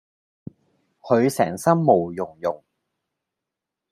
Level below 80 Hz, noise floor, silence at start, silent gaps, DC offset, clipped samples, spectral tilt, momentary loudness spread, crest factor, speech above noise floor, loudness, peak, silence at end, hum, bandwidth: -66 dBFS; -85 dBFS; 1.05 s; none; under 0.1%; under 0.1%; -6.5 dB/octave; 11 LU; 22 dB; 65 dB; -21 LUFS; -2 dBFS; 1.35 s; none; 15.5 kHz